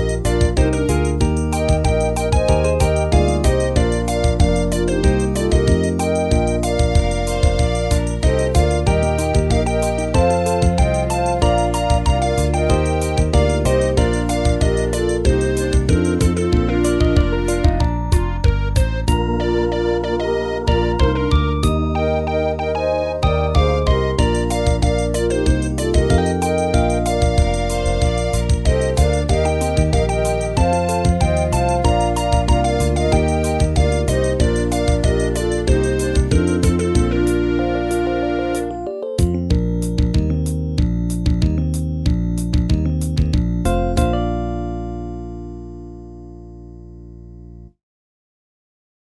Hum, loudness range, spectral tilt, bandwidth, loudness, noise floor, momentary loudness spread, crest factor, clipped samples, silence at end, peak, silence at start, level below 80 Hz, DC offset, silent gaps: none; 3 LU; -6 dB/octave; 11 kHz; -18 LUFS; -39 dBFS; 4 LU; 16 dB; under 0.1%; 1.45 s; -2 dBFS; 0 s; -22 dBFS; 0.1%; none